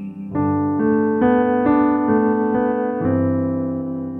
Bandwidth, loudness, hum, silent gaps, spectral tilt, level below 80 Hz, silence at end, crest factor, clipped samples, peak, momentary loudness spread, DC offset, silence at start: 3.8 kHz; -19 LUFS; none; none; -11.5 dB/octave; -50 dBFS; 0 s; 14 dB; under 0.1%; -6 dBFS; 7 LU; under 0.1%; 0 s